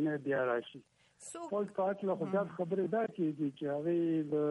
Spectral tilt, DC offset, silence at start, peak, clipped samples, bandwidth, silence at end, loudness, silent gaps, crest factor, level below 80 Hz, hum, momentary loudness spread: -7 dB/octave; under 0.1%; 0 s; -22 dBFS; under 0.1%; 11.5 kHz; 0 s; -35 LUFS; none; 12 dB; -82 dBFS; none; 7 LU